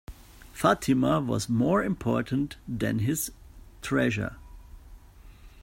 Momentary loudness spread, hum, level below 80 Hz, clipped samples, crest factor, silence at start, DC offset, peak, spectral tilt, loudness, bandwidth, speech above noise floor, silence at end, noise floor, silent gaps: 10 LU; none; -48 dBFS; under 0.1%; 20 dB; 0.1 s; under 0.1%; -8 dBFS; -5.5 dB/octave; -27 LUFS; 16 kHz; 24 dB; 0 s; -50 dBFS; none